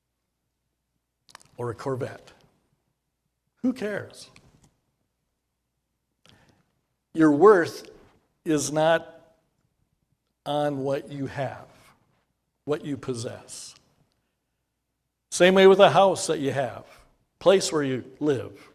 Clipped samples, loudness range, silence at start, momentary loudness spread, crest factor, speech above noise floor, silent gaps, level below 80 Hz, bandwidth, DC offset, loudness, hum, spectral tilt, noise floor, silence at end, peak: under 0.1%; 16 LU; 1.6 s; 22 LU; 24 dB; 57 dB; none; -66 dBFS; 14 kHz; under 0.1%; -23 LUFS; none; -5 dB/octave; -79 dBFS; 0.25 s; -2 dBFS